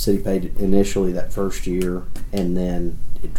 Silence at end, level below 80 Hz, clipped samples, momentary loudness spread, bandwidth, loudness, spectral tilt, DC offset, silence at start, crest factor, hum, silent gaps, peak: 0 s; -28 dBFS; under 0.1%; 10 LU; 15.5 kHz; -23 LUFS; -6.5 dB/octave; under 0.1%; 0 s; 16 dB; none; none; -2 dBFS